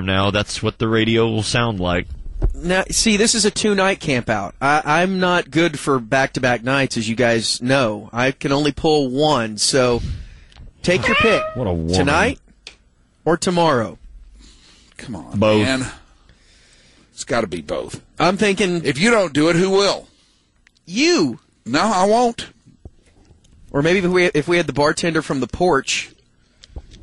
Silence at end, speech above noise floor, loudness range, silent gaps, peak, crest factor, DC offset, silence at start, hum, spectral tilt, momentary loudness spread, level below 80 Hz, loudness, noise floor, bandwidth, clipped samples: 0.05 s; 40 dB; 5 LU; none; -4 dBFS; 16 dB; under 0.1%; 0 s; none; -4 dB/octave; 11 LU; -38 dBFS; -18 LUFS; -57 dBFS; 11.5 kHz; under 0.1%